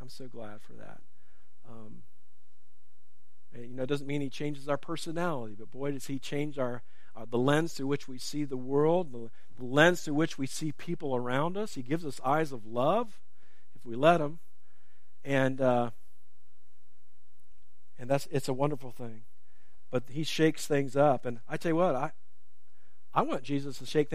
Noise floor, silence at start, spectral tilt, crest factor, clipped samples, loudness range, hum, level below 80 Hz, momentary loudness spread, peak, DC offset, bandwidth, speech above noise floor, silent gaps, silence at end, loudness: -75 dBFS; 0 s; -5.5 dB/octave; 26 dB; under 0.1%; 7 LU; none; -70 dBFS; 19 LU; -6 dBFS; 2%; 15.5 kHz; 44 dB; none; 0 s; -31 LUFS